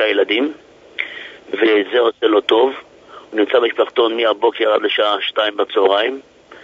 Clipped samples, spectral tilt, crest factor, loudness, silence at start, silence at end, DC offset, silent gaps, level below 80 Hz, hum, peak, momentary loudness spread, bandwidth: under 0.1%; -4 dB/octave; 16 dB; -16 LUFS; 0 s; 0.05 s; under 0.1%; none; -68 dBFS; none; 0 dBFS; 11 LU; 7.4 kHz